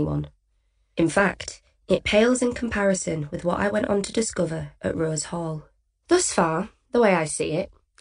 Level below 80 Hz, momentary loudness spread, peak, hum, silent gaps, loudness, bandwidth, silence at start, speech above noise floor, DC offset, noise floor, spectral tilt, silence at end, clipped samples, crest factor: -48 dBFS; 11 LU; -6 dBFS; none; none; -24 LUFS; 10.5 kHz; 0 s; 44 dB; under 0.1%; -67 dBFS; -4.5 dB/octave; 0.35 s; under 0.1%; 18 dB